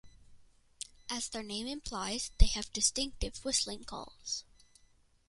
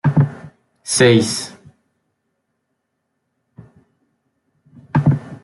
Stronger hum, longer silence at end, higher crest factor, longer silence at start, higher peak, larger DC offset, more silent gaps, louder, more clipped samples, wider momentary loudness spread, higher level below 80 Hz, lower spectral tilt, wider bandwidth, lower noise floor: neither; first, 0.9 s vs 0.05 s; first, 26 dB vs 20 dB; about the same, 0.05 s vs 0.05 s; second, -10 dBFS vs -2 dBFS; neither; neither; second, -35 LUFS vs -16 LUFS; neither; second, 14 LU vs 21 LU; first, -40 dBFS vs -54 dBFS; second, -2.5 dB/octave vs -5 dB/octave; about the same, 11.5 kHz vs 12 kHz; second, -66 dBFS vs -73 dBFS